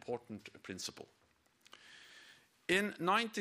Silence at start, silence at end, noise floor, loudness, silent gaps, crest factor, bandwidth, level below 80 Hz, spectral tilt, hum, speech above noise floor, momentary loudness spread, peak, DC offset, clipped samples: 0.05 s; 0 s; -70 dBFS; -37 LUFS; none; 22 dB; 15.5 kHz; -76 dBFS; -3.5 dB/octave; none; 32 dB; 24 LU; -18 dBFS; under 0.1%; under 0.1%